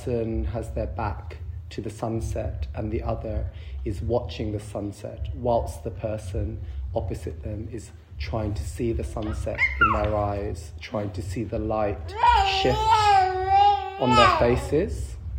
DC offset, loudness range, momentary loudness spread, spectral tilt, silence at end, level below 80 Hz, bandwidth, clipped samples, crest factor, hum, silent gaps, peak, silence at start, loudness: under 0.1%; 11 LU; 16 LU; -5.5 dB/octave; 0 s; -36 dBFS; 16 kHz; under 0.1%; 20 dB; none; none; -4 dBFS; 0 s; -25 LUFS